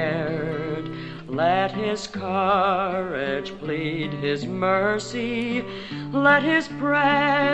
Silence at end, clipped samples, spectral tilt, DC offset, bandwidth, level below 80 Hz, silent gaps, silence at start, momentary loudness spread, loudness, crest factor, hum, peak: 0 s; under 0.1%; -5.5 dB/octave; under 0.1%; 9 kHz; -56 dBFS; none; 0 s; 11 LU; -23 LUFS; 18 dB; none; -6 dBFS